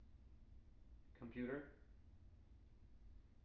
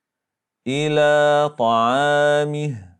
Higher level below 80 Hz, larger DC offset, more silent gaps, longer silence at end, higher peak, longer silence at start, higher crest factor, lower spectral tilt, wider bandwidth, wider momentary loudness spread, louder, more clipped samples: about the same, -66 dBFS vs -68 dBFS; neither; neither; second, 0 s vs 0.15 s; second, -34 dBFS vs -6 dBFS; second, 0 s vs 0.65 s; first, 22 dB vs 14 dB; first, -7 dB/octave vs -5 dB/octave; second, 5.6 kHz vs 10 kHz; first, 20 LU vs 10 LU; second, -51 LUFS vs -18 LUFS; neither